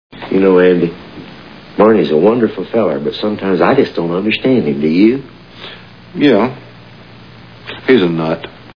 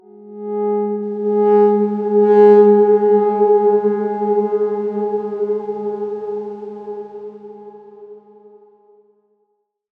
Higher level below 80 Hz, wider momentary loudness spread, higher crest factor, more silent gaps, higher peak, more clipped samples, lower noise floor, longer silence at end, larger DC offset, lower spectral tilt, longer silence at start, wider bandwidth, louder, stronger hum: first, -50 dBFS vs -74 dBFS; about the same, 21 LU vs 20 LU; about the same, 14 dB vs 16 dB; neither; about the same, 0 dBFS vs -2 dBFS; neither; second, -37 dBFS vs -68 dBFS; second, 0.05 s vs 1.8 s; first, 0.4% vs under 0.1%; second, -8.5 dB/octave vs -10 dB/octave; about the same, 0.15 s vs 0.2 s; first, 5.4 kHz vs 3.3 kHz; about the same, -13 LUFS vs -15 LUFS; neither